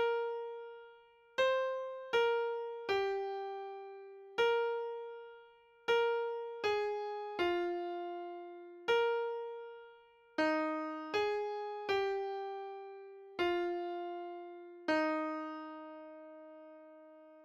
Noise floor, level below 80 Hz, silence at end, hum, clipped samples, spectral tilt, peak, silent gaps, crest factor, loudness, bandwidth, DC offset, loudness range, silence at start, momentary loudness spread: -62 dBFS; -76 dBFS; 0 s; none; under 0.1%; -4 dB/octave; -22 dBFS; none; 16 dB; -37 LUFS; 8 kHz; under 0.1%; 3 LU; 0 s; 19 LU